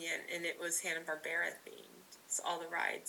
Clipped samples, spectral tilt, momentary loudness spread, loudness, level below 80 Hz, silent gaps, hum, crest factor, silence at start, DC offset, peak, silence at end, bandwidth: under 0.1%; -0.5 dB/octave; 18 LU; -38 LUFS; under -90 dBFS; none; none; 18 dB; 0 s; under 0.1%; -22 dBFS; 0 s; 19 kHz